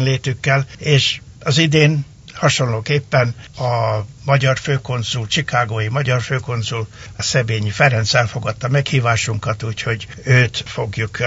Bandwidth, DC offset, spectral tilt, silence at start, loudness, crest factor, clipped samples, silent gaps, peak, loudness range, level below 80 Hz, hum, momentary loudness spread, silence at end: 8 kHz; under 0.1%; -4.5 dB/octave; 0 s; -18 LUFS; 18 dB; under 0.1%; none; 0 dBFS; 2 LU; -46 dBFS; none; 9 LU; 0 s